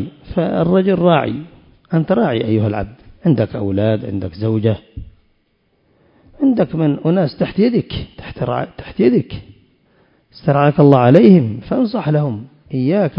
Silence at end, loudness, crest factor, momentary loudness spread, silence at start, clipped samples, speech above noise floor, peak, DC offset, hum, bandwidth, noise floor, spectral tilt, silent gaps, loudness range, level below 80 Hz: 0 s; -16 LUFS; 16 dB; 16 LU; 0 s; under 0.1%; 47 dB; 0 dBFS; under 0.1%; none; 5.4 kHz; -61 dBFS; -10.5 dB/octave; none; 6 LU; -42 dBFS